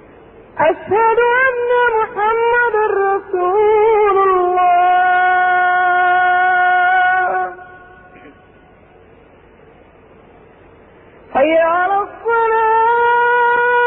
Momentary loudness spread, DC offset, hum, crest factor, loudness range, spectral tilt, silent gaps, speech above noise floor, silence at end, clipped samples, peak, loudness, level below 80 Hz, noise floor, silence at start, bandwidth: 5 LU; under 0.1%; none; 12 dB; 8 LU; -9 dB/octave; none; 31 dB; 0 s; under 0.1%; -4 dBFS; -13 LUFS; -52 dBFS; -45 dBFS; 0.55 s; 3.9 kHz